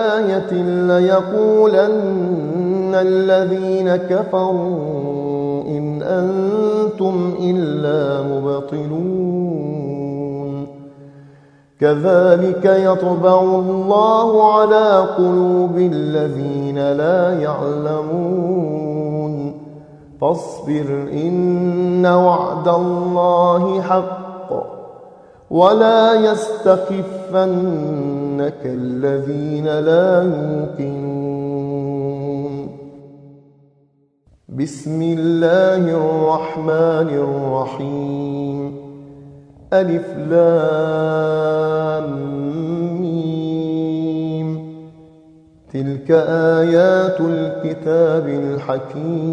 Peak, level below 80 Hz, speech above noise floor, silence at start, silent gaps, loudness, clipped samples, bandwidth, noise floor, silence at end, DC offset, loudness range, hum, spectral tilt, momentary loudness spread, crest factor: 0 dBFS; -58 dBFS; 42 dB; 0 s; none; -17 LUFS; under 0.1%; 9.8 kHz; -58 dBFS; 0 s; under 0.1%; 8 LU; none; -8 dB/octave; 11 LU; 16 dB